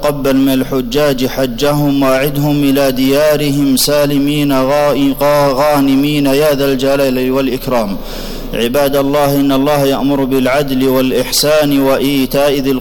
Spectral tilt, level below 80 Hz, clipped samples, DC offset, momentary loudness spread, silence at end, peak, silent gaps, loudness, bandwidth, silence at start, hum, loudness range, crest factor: -5 dB/octave; -30 dBFS; under 0.1%; under 0.1%; 4 LU; 0 s; -2 dBFS; none; -12 LUFS; 19.5 kHz; 0 s; none; 2 LU; 8 dB